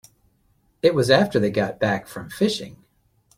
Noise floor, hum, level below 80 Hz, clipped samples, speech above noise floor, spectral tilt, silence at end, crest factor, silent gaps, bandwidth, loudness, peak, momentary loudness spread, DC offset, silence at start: -64 dBFS; none; -56 dBFS; under 0.1%; 43 dB; -5.5 dB/octave; 0.65 s; 22 dB; none; 16 kHz; -21 LUFS; -2 dBFS; 12 LU; under 0.1%; 0.85 s